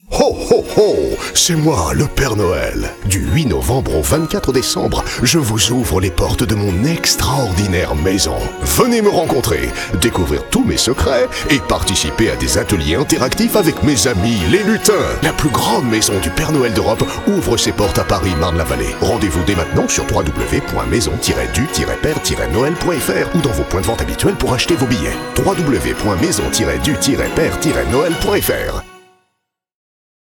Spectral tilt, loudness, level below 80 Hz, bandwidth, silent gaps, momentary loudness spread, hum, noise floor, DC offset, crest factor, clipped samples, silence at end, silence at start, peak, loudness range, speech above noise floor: -4.5 dB/octave; -15 LUFS; -26 dBFS; 20 kHz; none; 4 LU; none; -72 dBFS; under 0.1%; 16 dB; under 0.1%; 1.4 s; 0.1 s; 0 dBFS; 2 LU; 57 dB